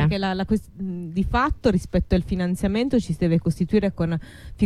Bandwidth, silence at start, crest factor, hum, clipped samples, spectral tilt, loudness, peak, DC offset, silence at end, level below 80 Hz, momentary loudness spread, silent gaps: 12.5 kHz; 0 s; 14 dB; none; under 0.1%; -7.5 dB/octave; -23 LUFS; -8 dBFS; under 0.1%; 0 s; -34 dBFS; 7 LU; none